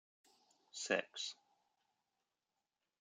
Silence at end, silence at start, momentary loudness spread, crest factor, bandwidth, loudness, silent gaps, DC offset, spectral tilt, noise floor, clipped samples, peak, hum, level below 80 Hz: 1.65 s; 0.75 s; 16 LU; 28 dB; 10 kHz; -42 LUFS; none; under 0.1%; -1.5 dB/octave; under -90 dBFS; under 0.1%; -22 dBFS; none; under -90 dBFS